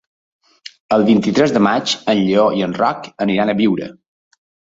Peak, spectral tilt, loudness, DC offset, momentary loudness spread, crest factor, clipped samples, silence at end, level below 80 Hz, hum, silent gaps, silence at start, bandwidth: -2 dBFS; -5.5 dB/octave; -16 LUFS; under 0.1%; 6 LU; 16 dB; under 0.1%; 0.85 s; -56 dBFS; none; none; 0.9 s; 7.8 kHz